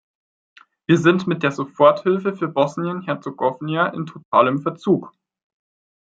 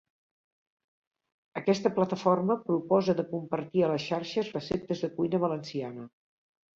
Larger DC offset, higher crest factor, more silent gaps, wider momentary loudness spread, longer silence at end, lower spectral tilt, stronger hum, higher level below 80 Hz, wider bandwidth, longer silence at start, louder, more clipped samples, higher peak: neither; about the same, 18 dB vs 20 dB; first, 4.25-4.32 s vs none; about the same, 10 LU vs 10 LU; first, 1 s vs 0.65 s; about the same, -7 dB/octave vs -7 dB/octave; neither; about the same, -68 dBFS vs -66 dBFS; about the same, 7.8 kHz vs 7.6 kHz; second, 0.9 s vs 1.55 s; first, -19 LUFS vs -29 LUFS; neither; first, -2 dBFS vs -10 dBFS